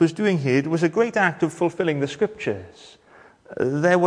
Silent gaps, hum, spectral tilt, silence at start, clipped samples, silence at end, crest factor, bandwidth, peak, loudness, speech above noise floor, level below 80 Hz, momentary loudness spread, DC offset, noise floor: none; none; -6.5 dB/octave; 0 s; under 0.1%; 0 s; 16 dB; 10.5 kHz; -6 dBFS; -22 LUFS; 28 dB; -64 dBFS; 9 LU; under 0.1%; -49 dBFS